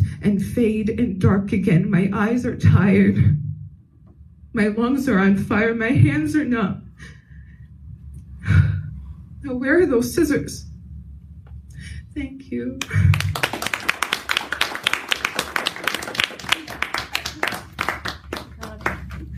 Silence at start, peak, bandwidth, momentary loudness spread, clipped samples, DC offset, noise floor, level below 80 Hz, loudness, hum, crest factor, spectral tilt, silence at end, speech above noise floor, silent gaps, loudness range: 0 s; 0 dBFS; 15.5 kHz; 20 LU; under 0.1%; under 0.1%; -47 dBFS; -40 dBFS; -20 LUFS; none; 20 dB; -6 dB/octave; 0 s; 29 dB; none; 6 LU